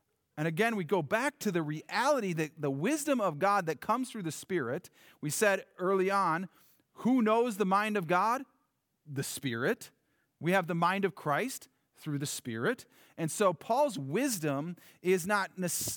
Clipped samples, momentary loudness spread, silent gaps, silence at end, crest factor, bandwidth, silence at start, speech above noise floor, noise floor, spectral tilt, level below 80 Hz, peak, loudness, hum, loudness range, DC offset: under 0.1%; 10 LU; none; 0 s; 18 dB; over 20 kHz; 0.35 s; 46 dB; -78 dBFS; -4.5 dB/octave; -78 dBFS; -14 dBFS; -31 LUFS; none; 3 LU; under 0.1%